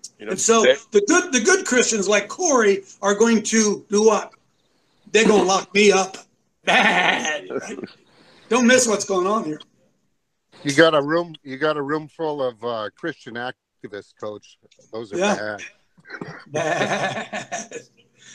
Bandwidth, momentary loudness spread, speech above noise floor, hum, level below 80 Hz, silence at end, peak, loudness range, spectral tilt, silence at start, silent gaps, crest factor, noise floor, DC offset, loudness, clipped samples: 13 kHz; 20 LU; 52 dB; none; -66 dBFS; 0 s; 0 dBFS; 10 LU; -3 dB/octave; 0.05 s; none; 20 dB; -72 dBFS; under 0.1%; -19 LUFS; under 0.1%